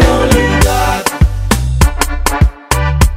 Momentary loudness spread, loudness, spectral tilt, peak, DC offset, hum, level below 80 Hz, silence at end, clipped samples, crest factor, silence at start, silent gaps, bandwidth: 5 LU; -12 LUFS; -5 dB/octave; 0 dBFS; under 0.1%; none; -14 dBFS; 0 s; 0.6%; 10 dB; 0 s; none; 16.5 kHz